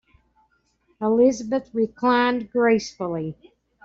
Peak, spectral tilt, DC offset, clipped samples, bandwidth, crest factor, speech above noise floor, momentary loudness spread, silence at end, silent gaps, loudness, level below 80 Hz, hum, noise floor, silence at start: -8 dBFS; -5.5 dB/octave; under 0.1%; under 0.1%; 7.8 kHz; 16 dB; 44 dB; 10 LU; 0.5 s; none; -22 LUFS; -60 dBFS; none; -66 dBFS; 1 s